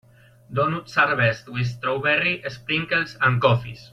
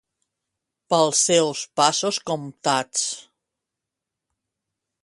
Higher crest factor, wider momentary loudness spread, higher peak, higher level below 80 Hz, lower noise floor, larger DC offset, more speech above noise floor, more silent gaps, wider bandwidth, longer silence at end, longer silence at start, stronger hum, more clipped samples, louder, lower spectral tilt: about the same, 18 dB vs 22 dB; about the same, 8 LU vs 10 LU; about the same, -4 dBFS vs -2 dBFS; first, -56 dBFS vs -72 dBFS; second, -49 dBFS vs -85 dBFS; neither; second, 27 dB vs 64 dB; neither; second, 7.8 kHz vs 11.5 kHz; second, 0.05 s vs 1.85 s; second, 0.5 s vs 0.9 s; neither; neither; about the same, -22 LUFS vs -21 LUFS; first, -6 dB/octave vs -2.5 dB/octave